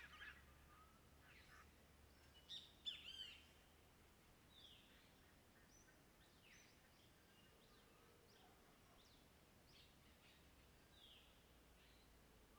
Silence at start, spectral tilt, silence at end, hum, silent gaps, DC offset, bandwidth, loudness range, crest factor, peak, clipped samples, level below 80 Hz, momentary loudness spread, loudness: 0 s; -2.5 dB/octave; 0 s; none; none; under 0.1%; over 20 kHz; 11 LU; 26 dB; -40 dBFS; under 0.1%; -78 dBFS; 16 LU; -62 LUFS